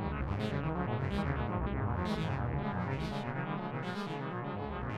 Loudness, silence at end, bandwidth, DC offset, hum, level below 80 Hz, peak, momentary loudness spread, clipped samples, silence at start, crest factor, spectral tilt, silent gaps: -36 LUFS; 0 s; 11.5 kHz; under 0.1%; none; -46 dBFS; -20 dBFS; 4 LU; under 0.1%; 0 s; 16 dB; -8 dB/octave; none